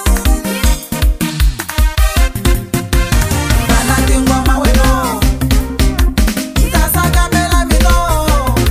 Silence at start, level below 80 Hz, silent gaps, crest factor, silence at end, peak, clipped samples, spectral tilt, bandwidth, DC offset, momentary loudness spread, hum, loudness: 0 s; -14 dBFS; none; 12 dB; 0 s; 0 dBFS; under 0.1%; -4.5 dB/octave; 16 kHz; under 0.1%; 4 LU; none; -13 LUFS